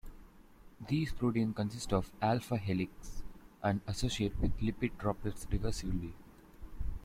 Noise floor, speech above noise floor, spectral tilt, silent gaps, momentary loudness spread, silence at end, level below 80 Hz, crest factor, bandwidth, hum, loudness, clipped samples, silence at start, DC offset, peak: -57 dBFS; 23 dB; -6 dB/octave; none; 18 LU; 0 s; -44 dBFS; 18 dB; 16 kHz; none; -36 LUFS; under 0.1%; 0.05 s; under 0.1%; -16 dBFS